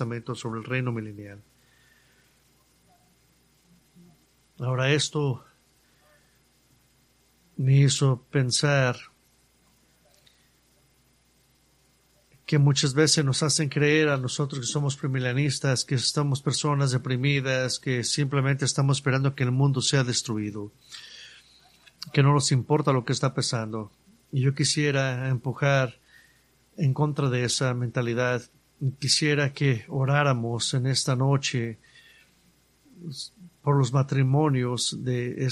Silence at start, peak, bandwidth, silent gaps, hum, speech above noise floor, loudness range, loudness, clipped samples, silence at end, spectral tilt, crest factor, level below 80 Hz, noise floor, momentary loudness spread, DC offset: 0 s; -6 dBFS; 12 kHz; none; none; 39 dB; 7 LU; -25 LUFS; under 0.1%; 0 s; -4.5 dB/octave; 20 dB; -62 dBFS; -64 dBFS; 13 LU; under 0.1%